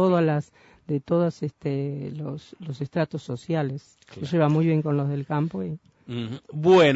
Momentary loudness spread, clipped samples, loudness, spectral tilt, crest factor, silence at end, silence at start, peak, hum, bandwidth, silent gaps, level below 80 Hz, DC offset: 15 LU; under 0.1%; -26 LUFS; -7.5 dB/octave; 18 dB; 0 s; 0 s; -6 dBFS; none; 8 kHz; none; -64 dBFS; under 0.1%